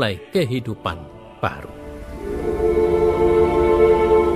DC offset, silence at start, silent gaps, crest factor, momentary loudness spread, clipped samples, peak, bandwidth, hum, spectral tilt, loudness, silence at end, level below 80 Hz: under 0.1%; 0 s; none; 14 dB; 19 LU; under 0.1%; -4 dBFS; 13.5 kHz; none; -7 dB/octave; -19 LUFS; 0 s; -34 dBFS